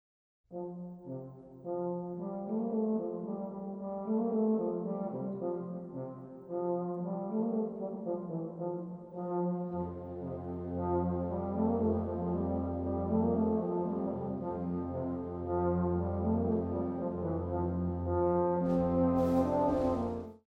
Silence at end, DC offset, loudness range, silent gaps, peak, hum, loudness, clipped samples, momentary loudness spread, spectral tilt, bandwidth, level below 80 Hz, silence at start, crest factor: 0.1 s; under 0.1%; 6 LU; none; -18 dBFS; none; -34 LUFS; under 0.1%; 12 LU; -11 dB/octave; 5.8 kHz; -54 dBFS; 0.5 s; 14 dB